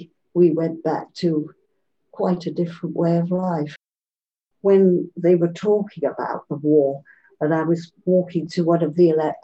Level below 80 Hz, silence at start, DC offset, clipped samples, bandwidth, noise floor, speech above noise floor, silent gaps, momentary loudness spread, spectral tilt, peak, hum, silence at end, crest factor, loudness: -70 dBFS; 0 s; under 0.1%; under 0.1%; 8 kHz; under -90 dBFS; over 70 dB; none; 9 LU; -9 dB/octave; -6 dBFS; none; 0.05 s; 16 dB; -21 LUFS